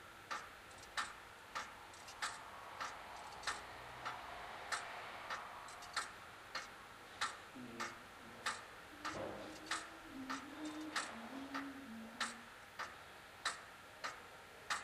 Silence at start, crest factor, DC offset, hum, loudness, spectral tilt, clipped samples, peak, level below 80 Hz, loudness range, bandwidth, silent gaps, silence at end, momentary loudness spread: 0 s; 24 dB; under 0.1%; none; -47 LUFS; -2 dB/octave; under 0.1%; -26 dBFS; -74 dBFS; 2 LU; 15.5 kHz; none; 0 s; 10 LU